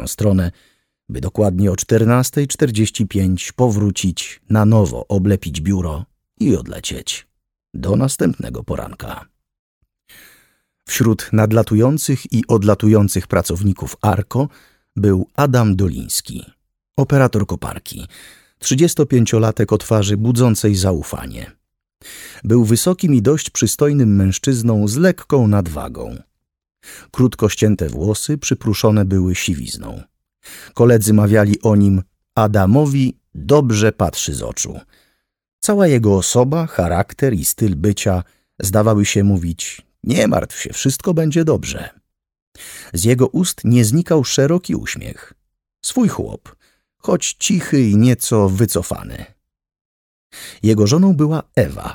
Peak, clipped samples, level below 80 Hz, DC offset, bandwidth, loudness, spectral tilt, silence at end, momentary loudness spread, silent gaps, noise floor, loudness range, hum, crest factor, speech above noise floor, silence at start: -2 dBFS; under 0.1%; -40 dBFS; under 0.1%; 18.5 kHz; -16 LUFS; -6 dB/octave; 0 s; 15 LU; 9.59-9.81 s, 35.53-35.59 s, 42.42-42.52 s, 49.81-50.30 s; -62 dBFS; 5 LU; none; 16 dB; 47 dB; 0 s